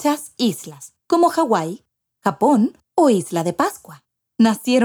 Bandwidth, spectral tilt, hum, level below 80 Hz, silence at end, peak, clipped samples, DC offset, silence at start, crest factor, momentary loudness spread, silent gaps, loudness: 19.5 kHz; -5 dB/octave; none; -68 dBFS; 0 s; -4 dBFS; under 0.1%; under 0.1%; 0 s; 16 dB; 15 LU; none; -19 LUFS